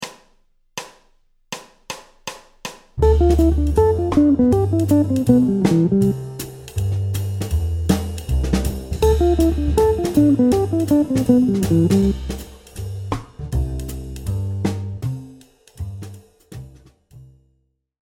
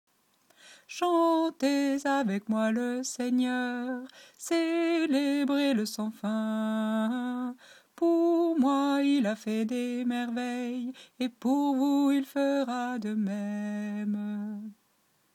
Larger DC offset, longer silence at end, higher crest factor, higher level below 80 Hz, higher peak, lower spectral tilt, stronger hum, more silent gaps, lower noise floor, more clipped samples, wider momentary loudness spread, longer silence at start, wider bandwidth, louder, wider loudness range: neither; first, 0.85 s vs 0.6 s; about the same, 18 dB vs 14 dB; first, -28 dBFS vs -82 dBFS; first, -2 dBFS vs -16 dBFS; first, -7.5 dB/octave vs -5 dB/octave; neither; neither; second, -66 dBFS vs -70 dBFS; neither; first, 19 LU vs 10 LU; second, 0 s vs 0.65 s; about the same, 17 kHz vs 15.5 kHz; first, -18 LUFS vs -29 LUFS; first, 12 LU vs 2 LU